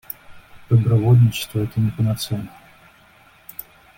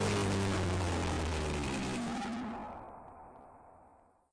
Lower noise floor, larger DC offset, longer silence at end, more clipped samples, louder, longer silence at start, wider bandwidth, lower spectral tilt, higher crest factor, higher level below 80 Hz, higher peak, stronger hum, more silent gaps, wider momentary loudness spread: second, -51 dBFS vs -64 dBFS; neither; about the same, 0.35 s vs 0.45 s; neither; first, -19 LUFS vs -35 LUFS; first, 0.3 s vs 0 s; first, 17 kHz vs 10.5 kHz; first, -7 dB/octave vs -5 dB/octave; first, 16 dB vs 10 dB; about the same, -48 dBFS vs -48 dBFS; first, -4 dBFS vs -26 dBFS; neither; neither; about the same, 21 LU vs 21 LU